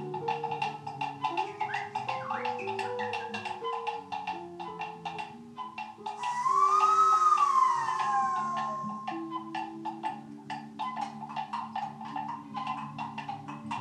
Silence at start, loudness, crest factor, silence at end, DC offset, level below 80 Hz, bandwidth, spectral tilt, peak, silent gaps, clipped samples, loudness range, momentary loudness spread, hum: 0 s; -31 LUFS; 18 dB; 0 s; under 0.1%; -78 dBFS; 11.5 kHz; -4 dB/octave; -14 dBFS; none; under 0.1%; 11 LU; 17 LU; none